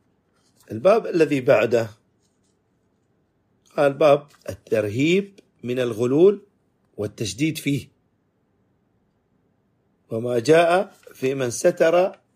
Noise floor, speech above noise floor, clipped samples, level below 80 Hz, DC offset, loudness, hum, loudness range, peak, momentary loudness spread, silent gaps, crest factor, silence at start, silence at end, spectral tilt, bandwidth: -67 dBFS; 47 dB; under 0.1%; -66 dBFS; under 0.1%; -21 LUFS; none; 9 LU; -4 dBFS; 16 LU; none; 18 dB; 0.7 s; 0.2 s; -5.5 dB/octave; 15.5 kHz